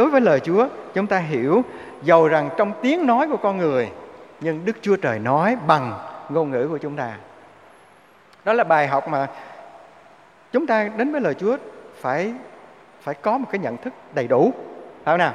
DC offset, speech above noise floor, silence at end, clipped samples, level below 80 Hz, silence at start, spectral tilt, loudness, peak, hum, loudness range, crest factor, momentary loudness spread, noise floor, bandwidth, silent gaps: under 0.1%; 31 dB; 0 s; under 0.1%; -68 dBFS; 0 s; -7 dB/octave; -21 LUFS; -2 dBFS; none; 5 LU; 20 dB; 14 LU; -51 dBFS; 10.5 kHz; none